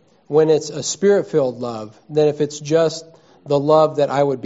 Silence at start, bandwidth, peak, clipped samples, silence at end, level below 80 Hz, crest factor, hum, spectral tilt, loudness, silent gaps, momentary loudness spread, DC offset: 0.3 s; 8 kHz; -2 dBFS; under 0.1%; 0 s; -62 dBFS; 16 dB; none; -5.5 dB/octave; -18 LUFS; none; 10 LU; under 0.1%